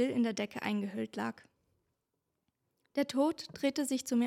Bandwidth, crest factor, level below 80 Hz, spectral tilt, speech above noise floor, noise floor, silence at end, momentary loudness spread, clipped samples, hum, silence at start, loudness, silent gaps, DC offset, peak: 16 kHz; 18 dB; -80 dBFS; -4.5 dB/octave; 51 dB; -85 dBFS; 0 s; 8 LU; under 0.1%; none; 0 s; -35 LUFS; none; under 0.1%; -18 dBFS